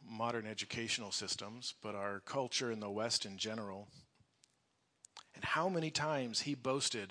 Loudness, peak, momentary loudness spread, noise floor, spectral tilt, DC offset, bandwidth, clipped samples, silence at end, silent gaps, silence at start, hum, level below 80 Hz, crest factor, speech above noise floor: -39 LUFS; -20 dBFS; 9 LU; -79 dBFS; -3 dB/octave; under 0.1%; 10.5 kHz; under 0.1%; 0 s; none; 0 s; none; -78 dBFS; 22 dB; 40 dB